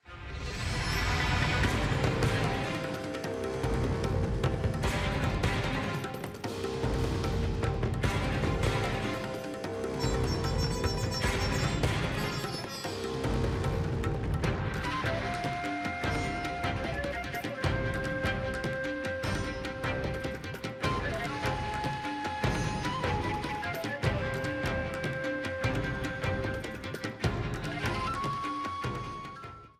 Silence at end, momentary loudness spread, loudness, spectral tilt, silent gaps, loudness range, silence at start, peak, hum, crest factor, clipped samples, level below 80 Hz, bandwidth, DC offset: 0.1 s; 6 LU; -32 LUFS; -5.5 dB/octave; none; 3 LU; 0.05 s; -12 dBFS; none; 20 dB; under 0.1%; -40 dBFS; 16 kHz; under 0.1%